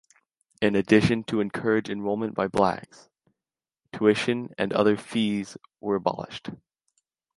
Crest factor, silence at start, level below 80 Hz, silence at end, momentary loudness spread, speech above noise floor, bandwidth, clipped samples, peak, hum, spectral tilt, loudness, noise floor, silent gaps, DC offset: 22 dB; 0.6 s; -58 dBFS; 0.8 s; 16 LU; over 65 dB; 11.5 kHz; under 0.1%; -6 dBFS; none; -6 dB/octave; -25 LUFS; under -90 dBFS; none; under 0.1%